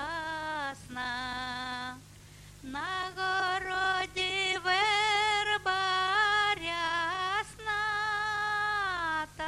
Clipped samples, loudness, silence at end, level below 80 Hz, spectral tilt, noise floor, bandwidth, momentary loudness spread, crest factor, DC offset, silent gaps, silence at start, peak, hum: under 0.1%; -30 LUFS; 0 s; -58 dBFS; -2 dB/octave; -52 dBFS; 14 kHz; 11 LU; 16 dB; under 0.1%; none; 0 s; -16 dBFS; none